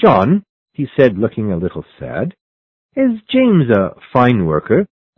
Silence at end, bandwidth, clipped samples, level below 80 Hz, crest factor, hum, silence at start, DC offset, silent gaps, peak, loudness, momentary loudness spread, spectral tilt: 0.3 s; 5.8 kHz; under 0.1%; -42 dBFS; 14 dB; none; 0 s; under 0.1%; 0.49-0.66 s, 2.41-2.89 s; 0 dBFS; -15 LUFS; 13 LU; -10 dB/octave